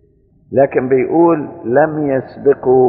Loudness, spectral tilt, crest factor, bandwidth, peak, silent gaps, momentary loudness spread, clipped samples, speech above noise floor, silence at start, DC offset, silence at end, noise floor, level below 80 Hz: -14 LUFS; -9.5 dB/octave; 14 dB; 4.6 kHz; 0 dBFS; none; 6 LU; under 0.1%; 38 dB; 0.5 s; under 0.1%; 0 s; -51 dBFS; -52 dBFS